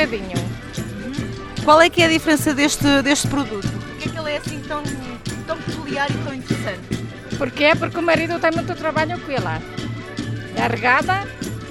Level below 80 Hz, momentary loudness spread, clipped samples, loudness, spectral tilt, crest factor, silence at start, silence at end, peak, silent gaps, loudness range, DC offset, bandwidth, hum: -42 dBFS; 13 LU; under 0.1%; -20 LUFS; -4.5 dB/octave; 20 dB; 0 s; 0 s; 0 dBFS; none; 8 LU; under 0.1%; 16.5 kHz; none